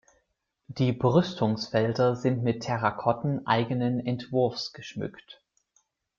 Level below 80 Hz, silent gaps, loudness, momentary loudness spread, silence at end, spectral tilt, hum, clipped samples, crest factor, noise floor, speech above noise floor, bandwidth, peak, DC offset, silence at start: -62 dBFS; none; -27 LUFS; 12 LU; 0.85 s; -7 dB/octave; none; under 0.1%; 20 dB; -77 dBFS; 50 dB; 7.4 kHz; -8 dBFS; under 0.1%; 0.7 s